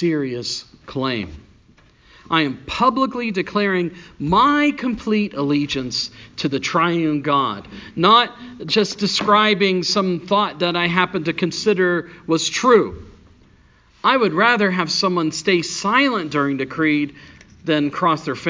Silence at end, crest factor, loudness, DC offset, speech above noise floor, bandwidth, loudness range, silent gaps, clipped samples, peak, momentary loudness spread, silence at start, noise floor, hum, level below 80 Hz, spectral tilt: 0 s; 18 dB; -19 LUFS; under 0.1%; 34 dB; 7.6 kHz; 4 LU; none; under 0.1%; 0 dBFS; 10 LU; 0 s; -53 dBFS; none; -50 dBFS; -4.5 dB/octave